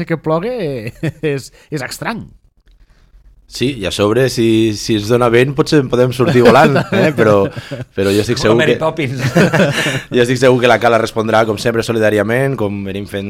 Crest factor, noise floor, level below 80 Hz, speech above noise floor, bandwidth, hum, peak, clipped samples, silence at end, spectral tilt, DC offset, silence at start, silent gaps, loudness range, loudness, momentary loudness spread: 14 dB; -48 dBFS; -42 dBFS; 35 dB; 16.5 kHz; none; 0 dBFS; under 0.1%; 0 s; -5.5 dB/octave; under 0.1%; 0 s; none; 10 LU; -13 LUFS; 12 LU